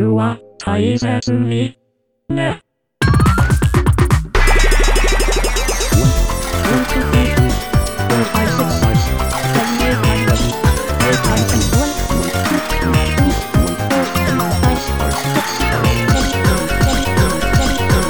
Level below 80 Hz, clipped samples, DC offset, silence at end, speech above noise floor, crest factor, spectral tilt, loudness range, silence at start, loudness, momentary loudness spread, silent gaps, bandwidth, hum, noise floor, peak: -20 dBFS; under 0.1%; under 0.1%; 0 s; 28 dB; 14 dB; -5 dB/octave; 1 LU; 0 s; -15 LUFS; 4 LU; none; over 20 kHz; none; -44 dBFS; 0 dBFS